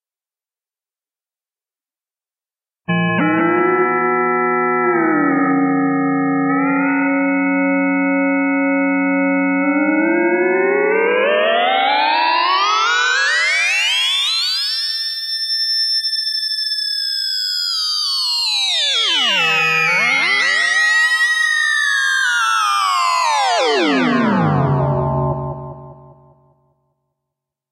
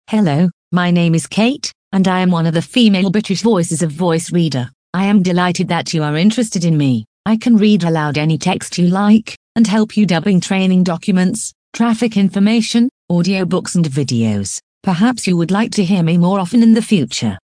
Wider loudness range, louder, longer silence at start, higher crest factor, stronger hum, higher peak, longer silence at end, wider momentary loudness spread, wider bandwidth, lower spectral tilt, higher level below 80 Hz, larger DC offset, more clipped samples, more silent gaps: first, 5 LU vs 1 LU; about the same, -15 LUFS vs -15 LUFS; first, 2.9 s vs 0.1 s; about the same, 12 dB vs 14 dB; neither; second, -4 dBFS vs 0 dBFS; first, 1.65 s vs 0.1 s; about the same, 4 LU vs 6 LU; first, 15 kHz vs 10.5 kHz; second, -3.5 dB/octave vs -6 dB/octave; about the same, -50 dBFS vs -54 dBFS; neither; neither; second, none vs 0.53-0.71 s, 1.75-1.91 s, 4.74-4.93 s, 7.07-7.24 s, 9.37-9.55 s, 11.55-11.72 s, 12.91-13.08 s, 14.63-14.81 s